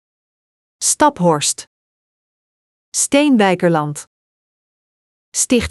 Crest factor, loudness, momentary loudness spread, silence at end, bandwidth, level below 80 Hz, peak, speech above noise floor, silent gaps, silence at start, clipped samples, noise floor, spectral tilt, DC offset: 18 dB; -15 LUFS; 11 LU; 0 s; 14 kHz; -52 dBFS; 0 dBFS; over 75 dB; 1.67-2.92 s, 4.07-5.32 s; 0.8 s; under 0.1%; under -90 dBFS; -3.5 dB/octave; under 0.1%